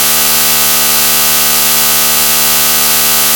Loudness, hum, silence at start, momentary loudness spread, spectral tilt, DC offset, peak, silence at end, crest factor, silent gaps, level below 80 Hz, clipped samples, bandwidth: -6 LUFS; none; 0 s; 0 LU; 0.5 dB/octave; 1%; 0 dBFS; 0 s; 10 dB; none; -42 dBFS; 0.3%; over 20 kHz